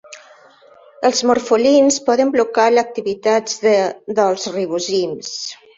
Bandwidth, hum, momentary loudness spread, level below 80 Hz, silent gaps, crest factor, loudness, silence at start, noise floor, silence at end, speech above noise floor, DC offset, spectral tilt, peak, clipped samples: 8 kHz; none; 9 LU; -62 dBFS; none; 14 dB; -16 LUFS; 0.1 s; -47 dBFS; 0.25 s; 31 dB; under 0.1%; -3 dB/octave; -2 dBFS; under 0.1%